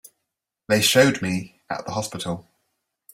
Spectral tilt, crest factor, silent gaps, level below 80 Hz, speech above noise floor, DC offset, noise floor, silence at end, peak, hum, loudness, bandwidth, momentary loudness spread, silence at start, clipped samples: -3.5 dB/octave; 22 dB; none; -60 dBFS; 60 dB; under 0.1%; -82 dBFS; 0.75 s; -2 dBFS; none; -22 LUFS; 16.5 kHz; 16 LU; 0.7 s; under 0.1%